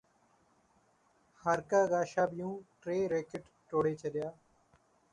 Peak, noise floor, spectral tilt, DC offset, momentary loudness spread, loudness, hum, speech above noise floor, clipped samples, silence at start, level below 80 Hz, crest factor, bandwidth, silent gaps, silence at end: -18 dBFS; -71 dBFS; -6 dB/octave; under 0.1%; 14 LU; -34 LUFS; none; 37 dB; under 0.1%; 1.45 s; -72 dBFS; 18 dB; 11 kHz; none; 0.8 s